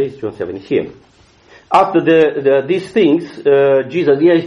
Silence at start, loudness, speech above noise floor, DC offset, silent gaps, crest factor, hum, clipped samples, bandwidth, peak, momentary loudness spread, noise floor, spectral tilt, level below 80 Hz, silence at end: 0 s; -14 LUFS; 33 dB; under 0.1%; none; 14 dB; none; under 0.1%; 10.5 kHz; 0 dBFS; 11 LU; -46 dBFS; -7.5 dB/octave; -56 dBFS; 0 s